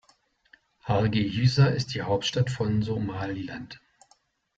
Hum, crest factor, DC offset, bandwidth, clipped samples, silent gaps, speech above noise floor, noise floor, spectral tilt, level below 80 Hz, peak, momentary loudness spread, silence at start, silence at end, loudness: none; 18 dB; under 0.1%; 7.8 kHz; under 0.1%; none; 40 dB; -66 dBFS; -6.5 dB/octave; -54 dBFS; -10 dBFS; 17 LU; 0.85 s; 0.8 s; -26 LUFS